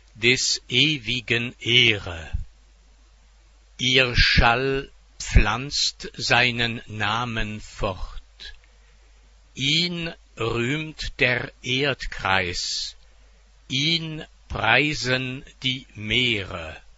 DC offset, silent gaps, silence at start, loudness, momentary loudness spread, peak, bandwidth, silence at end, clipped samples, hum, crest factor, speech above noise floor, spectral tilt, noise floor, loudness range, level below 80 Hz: under 0.1%; none; 0.15 s; -22 LUFS; 16 LU; -2 dBFS; 8 kHz; 0.15 s; under 0.1%; none; 24 dB; 30 dB; -3.5 dB/octave; -53 dBFS; 6 LU; -34 dBFS